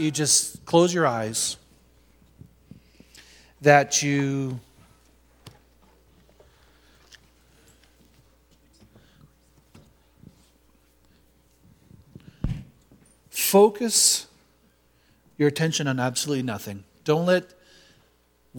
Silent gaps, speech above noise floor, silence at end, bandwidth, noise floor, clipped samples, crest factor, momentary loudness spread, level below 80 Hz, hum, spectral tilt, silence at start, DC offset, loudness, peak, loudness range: none; 41 dB; 0 s; 19 kHz; -63 dBFS; under 0.1%; 26 dB; 16 LU; -52 dBFS; none; -3.5 dB/octave; 0 s; under 0.1%; -22 LUFS; -2 dBFS; 16 LU